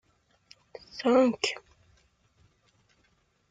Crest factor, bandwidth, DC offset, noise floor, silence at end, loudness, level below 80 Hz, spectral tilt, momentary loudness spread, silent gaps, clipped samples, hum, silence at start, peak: 22 dB; 9.4 kHz; under 0.1%; -70 dBFS; 1.9 s; -26 LUFS; -70 dBFS; -3.5 dB/octave; 26 LU; none; under 0.1%; none; 0.95 s; -10 dBFS